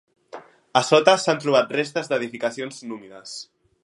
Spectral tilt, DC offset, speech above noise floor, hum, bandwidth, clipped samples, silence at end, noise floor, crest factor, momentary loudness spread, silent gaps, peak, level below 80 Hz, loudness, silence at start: -3.5 dB/octave; under 0.1%; 22 dB; none; 11.5 kHz; under 0.1%; 0.4 s; -43 dBFS; 22 dB; 20 LU; none; 0 dBFS; -76 dBFS; -21 LUFS; 0.35 s